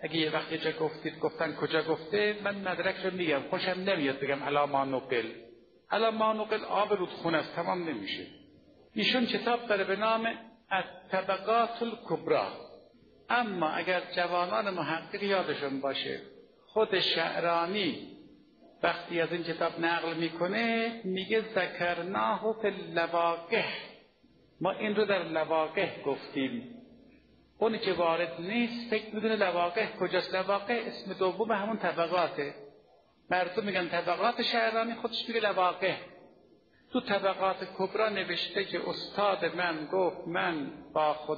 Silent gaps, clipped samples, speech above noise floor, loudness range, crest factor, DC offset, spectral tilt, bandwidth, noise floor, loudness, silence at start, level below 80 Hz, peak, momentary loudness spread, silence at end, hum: none; under 0.1%; 33 dB; 2 LU; 20 dB; under 0.1%; -2 dB/octave; 6.6 kHz; -63 dBFS; -31 LUFS; 0 s; -72 dBFS; -10 dBFS; 7 LU; 0 s; none